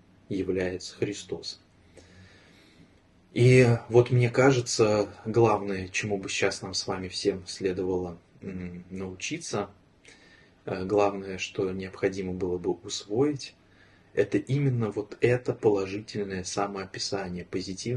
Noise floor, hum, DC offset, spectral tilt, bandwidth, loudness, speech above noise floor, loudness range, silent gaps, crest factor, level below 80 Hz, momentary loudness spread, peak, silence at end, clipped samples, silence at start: -59 dBFS; none; under 0.1%; -5.5 dB/octave; 11.5 kHz; -27 LUFS; 32 dB; 9 LU; none; 22 dB; -60 dBFS; 14 LU; -6 dBFS; 0 s; under 0.1%; 0.3 s